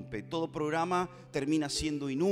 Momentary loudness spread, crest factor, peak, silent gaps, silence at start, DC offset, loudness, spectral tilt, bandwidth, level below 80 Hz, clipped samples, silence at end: 6 LU; 16 dB; -16 dBFS; none; 0 s; under 0.1%; -33 LUFS; -5 dB/octave; 15 kHz; -54 dBFS; under 0.1%; 0 s